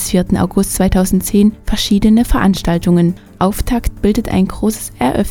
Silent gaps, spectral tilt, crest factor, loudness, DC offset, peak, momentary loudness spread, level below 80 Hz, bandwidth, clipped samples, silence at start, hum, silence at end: none; -5.5 dB/octave; 14 dB; -14 LUFS; under 0.1%; 0 dBFS; 6 LU; -24 dBFS; 18 kHz; under 0.1%; 0 s; none; 0 s